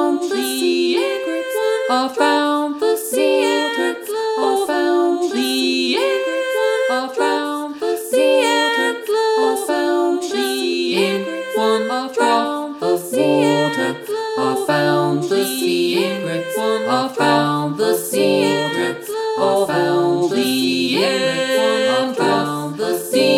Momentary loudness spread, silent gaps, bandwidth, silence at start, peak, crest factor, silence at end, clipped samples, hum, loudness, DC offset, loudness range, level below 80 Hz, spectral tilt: 6 LU; none; 17.5 kHz; 0 s; -2 dBFS; 14 dB; 0 s; under 0.1%; none; -18 LUFS; under 0.1%; 1 LU; -68 dBFS; -4 dB/octave